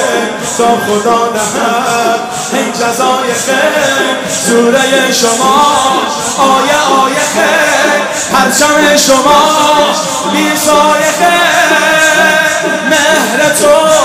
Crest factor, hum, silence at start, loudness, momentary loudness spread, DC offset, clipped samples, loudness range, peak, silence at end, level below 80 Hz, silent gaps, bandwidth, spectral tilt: 8 dB; none; 0 s; -8 LUFS; 6 LU; under 0.1%; 0.3%; 3 LU; 0 dBFS; 0 s; -46 dBFS; none; 16.5 kHz; -2 dB/octave